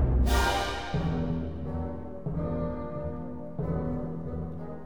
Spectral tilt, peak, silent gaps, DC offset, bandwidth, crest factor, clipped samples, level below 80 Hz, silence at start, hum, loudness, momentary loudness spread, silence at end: -6 dB/octave; -12 dBFS; none; 0.7%; over 20 kHz; 16 dB; under 0.1%; -34 dBFS; 0 s; none; -32 LUFS; 12 LU; 0 s